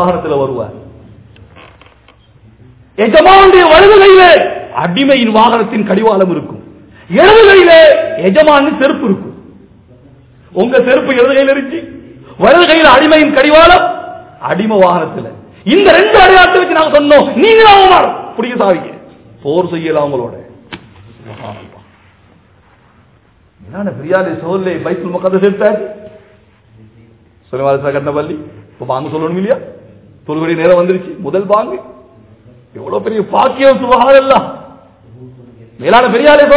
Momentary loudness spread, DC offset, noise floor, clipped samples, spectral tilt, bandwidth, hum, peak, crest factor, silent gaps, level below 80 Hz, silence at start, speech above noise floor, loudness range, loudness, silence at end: 19 LU; under 0.1%; -47 dBFS; 6%; -9 dB/octave; 4 kHz; none; 0 dBFS; 10 dB; none; -38 dBFS; 0 s; 40 dB; 13 LU; -8 LUFS; 0 s